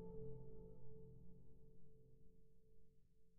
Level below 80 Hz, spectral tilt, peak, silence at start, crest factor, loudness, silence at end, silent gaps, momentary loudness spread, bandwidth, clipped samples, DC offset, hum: -68 dBFS; -12 dB/octave; -40 dBFS; 0 s; 14 dB; -61 LUFS; 0 s; none; 11 LU; 1.4 kHz; under 0.1%; under 0.1%; none